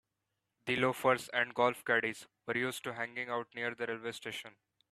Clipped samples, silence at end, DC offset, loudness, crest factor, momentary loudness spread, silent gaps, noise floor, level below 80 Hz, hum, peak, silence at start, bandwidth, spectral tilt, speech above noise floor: under 0.1%; 0.4 s; under 0.1%; -34 LUFS; 22 dB; 12 LU; none; -86 dBFS; -78 dBFS; none; -14 dBFS; 0.65 s; 14.5 kHz; -4 dB/octave; 51 dB